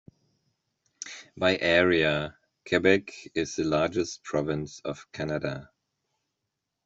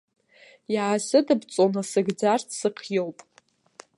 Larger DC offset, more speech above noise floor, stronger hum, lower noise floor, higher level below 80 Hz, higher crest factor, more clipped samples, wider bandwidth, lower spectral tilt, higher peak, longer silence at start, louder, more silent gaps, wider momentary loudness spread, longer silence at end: neither; first, 57 dB vs 31 dB; neither; first, -83 dBFS vs -55 dBFS; first, -60 dBFS vs -78 dBFS; about the same, 22 dB vs 18 dB; neither; second, 8 kHz vs 11.5 kHz; about the same, -4.5 dB/octave vs -4.5 dB/octave; about the same, -6 dBFS vs -8 dBFS; first, 1 s vs 0.7 s; second, -27 LUFS vs -24 LUFS; neither; first, 17 LU vs 7 LU; first, 1.25 s vs 0.85 s